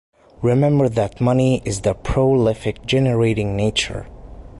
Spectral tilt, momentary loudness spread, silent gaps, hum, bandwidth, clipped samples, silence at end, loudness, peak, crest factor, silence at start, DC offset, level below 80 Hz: -6 dB/octave; 6 LU; none; none; 11.5 kHz; under 0.1%; 0 s; -19 LUFS; -6 dBFS; 12 dB; 0.4 s; under 0.1%; -36 dBFS